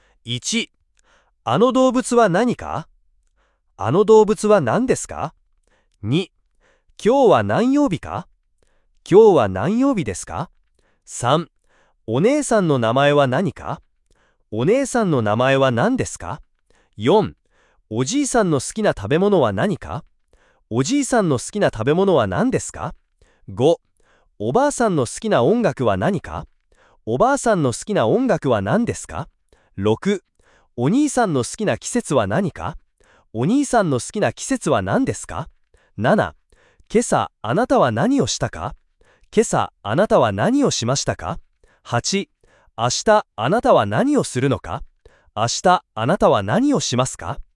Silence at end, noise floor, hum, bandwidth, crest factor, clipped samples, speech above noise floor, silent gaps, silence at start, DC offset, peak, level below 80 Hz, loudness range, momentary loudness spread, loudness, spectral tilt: 0.15 s; -63 dBFS; none; 12 kHz; 18 dB; under 0.1%; 45 dB; none; 0.25 s; under 0.1%; 0 dBFS; -48 dBFS; 3 LU; 15 LU; -19 LUFS; -5 dB/octave